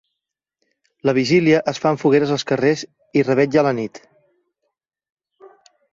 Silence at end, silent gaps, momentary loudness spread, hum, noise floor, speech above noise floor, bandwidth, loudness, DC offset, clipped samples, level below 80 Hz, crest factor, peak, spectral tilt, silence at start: 0.45 s; 5.12-5.17 s; 8 LU; none; -83 dBFS; 65 dB; 7.8 kHz; -18 LUFS; under 0.1%; under 0.1%; -60 dBFS; 18 dB; -2 dBFS; -6 dB/octave; 1.05 s